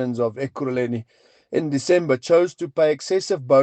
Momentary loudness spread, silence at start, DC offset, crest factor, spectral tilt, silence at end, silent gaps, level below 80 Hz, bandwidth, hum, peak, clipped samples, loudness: 9 LU; 0 s; under 0.1%; 16 dB; -5.5 dB/octave; 0 s; none; -68 dBFS; 9 kHz; none; -4 dBFS; under 0.1%; -22 LUFS